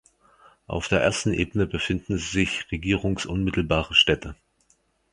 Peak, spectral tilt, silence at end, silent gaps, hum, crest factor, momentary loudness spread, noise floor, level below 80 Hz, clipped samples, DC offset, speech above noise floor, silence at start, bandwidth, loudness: -4 dBFS; -4.5 dB/octave; 0.8 s; none; none; 22 dB; 10 LU; -66 dBFS; -40 dBFS; under 0.1%; under 0.1%; 42 dB; 0.7 s; 11.5 kHz; -24 LUFS